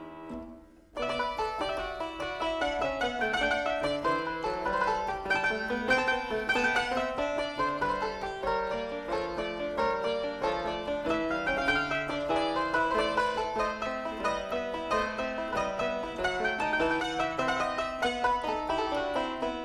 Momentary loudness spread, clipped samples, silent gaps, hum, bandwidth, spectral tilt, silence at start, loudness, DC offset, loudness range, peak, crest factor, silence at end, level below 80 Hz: 6 LU; under 0.1%; none; none; 13.5 kHz; -4 dB/octave; 0 s; -30 LUFS; under 0.1%; 3 LU; -14 dBFS; 18 dB; 0 s; -52 dBFS